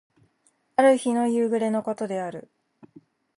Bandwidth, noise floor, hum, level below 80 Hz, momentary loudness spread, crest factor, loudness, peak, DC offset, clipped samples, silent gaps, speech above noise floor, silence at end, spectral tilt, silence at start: 11.5 kHz; -68 dBFS; none; -76 dBFS; 12 LU; 18 dB; -24 LUFS; -8 dBFS; under 0.1%; under 0.1%; none; 45 dB; 0.95 s; -5.5 dB/octave; 0.8 s